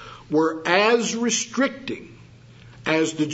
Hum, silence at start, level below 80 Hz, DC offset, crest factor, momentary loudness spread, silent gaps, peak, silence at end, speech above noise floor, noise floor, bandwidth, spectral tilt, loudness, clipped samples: none; 0 s; -60 dBFS; under 0.1%; 22 dB; 15 LU; none; -2 dBFS; 0 s; 25 dB; -47 dBFS; 8 kHz; -3 dB/octave; -21 LUFS; under 0.1%